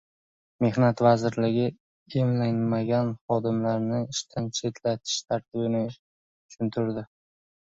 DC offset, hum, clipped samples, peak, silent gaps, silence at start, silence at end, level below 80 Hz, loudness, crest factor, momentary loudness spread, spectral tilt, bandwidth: under 0.1%; none; under 0.1%; -8 dBFS; 1.80-2.06 s, 3.21-3.28 s, 5.99-6.49 s; 0.6 s; 0.6 s; -62 dBFS; -27 LUFS; 20 dB; 9 LU; -6 dB/octave; 7.8 kHz